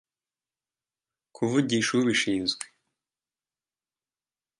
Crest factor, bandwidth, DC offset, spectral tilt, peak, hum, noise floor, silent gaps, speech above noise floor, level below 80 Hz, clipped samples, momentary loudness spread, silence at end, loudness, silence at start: 20 dB; 11.5 kHz; under 0.1%; -4 dB/octave; -10 dBFS; none; under -90 dBFS; none; over 65 dB; -68 dBFS; under 0.1%; 10 LU; 1.95 s; -26 LUFS; 1.4 s